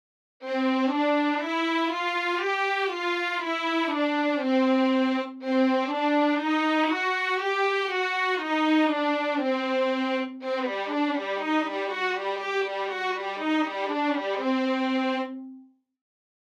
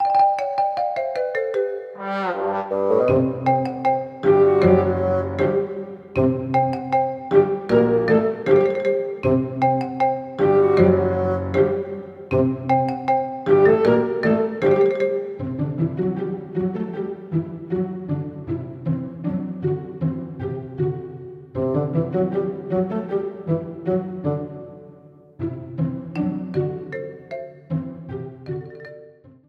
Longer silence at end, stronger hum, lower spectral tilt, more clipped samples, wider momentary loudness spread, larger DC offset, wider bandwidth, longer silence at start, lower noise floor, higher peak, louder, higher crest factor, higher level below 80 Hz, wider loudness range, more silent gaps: first, 0.8 s vs 0.2 s; neither; second, -3 dB/octave vs -9.5 dB/octave; neither; second, 6 LU vs 14 LU; neither; first, 10.5 kHz vs 6.2 kHz; first, 0.4 s vs 0 s; first, -51 dBFS vs -46 dBFS; second, -12 dBFS vs -2 dBFS; second, -26 LUFS vs -21 LUFS; about the same, 14 dB vs 18 dB; second, under -90 dBFS vs -54 dBFS; second, 3 LU vs 8 LU; neither